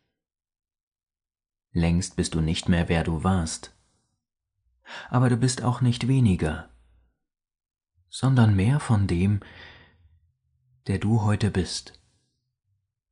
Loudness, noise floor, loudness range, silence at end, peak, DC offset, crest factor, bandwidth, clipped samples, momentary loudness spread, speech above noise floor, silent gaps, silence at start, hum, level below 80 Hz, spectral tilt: -24 LUFS; -81 dBFS; 3 LU; 1.2 s; -8 dBFS; under 0.1%; 18 dB; 10.5 kHz; under 0.1%; 12 LU; 58 dB; none; 1.75 s; none; -44 dBFS; -6 dB/octave